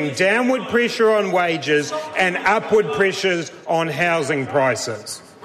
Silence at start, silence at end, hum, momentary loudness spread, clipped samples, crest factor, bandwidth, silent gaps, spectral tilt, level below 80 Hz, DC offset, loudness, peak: 0 s; 0.2 s; none; 7 LU; under 0.1%; 12 dB; 14 kHz; none; -4 dB/octave; -62 dBFS; under 0.1%; -19 LUFS; -6 dBFS